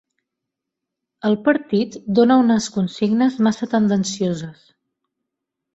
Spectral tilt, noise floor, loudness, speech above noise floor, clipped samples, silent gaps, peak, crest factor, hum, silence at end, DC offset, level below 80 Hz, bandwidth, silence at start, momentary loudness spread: -6 dB/octave; -82 dBFS; -19 LUFS; 64 dB; under 0.1%; none; -2 dBFS; 18 dB; none; 1.25 s; under 0.1%; -60 dBFS; 8 kHz; 1.25 s; 9 LU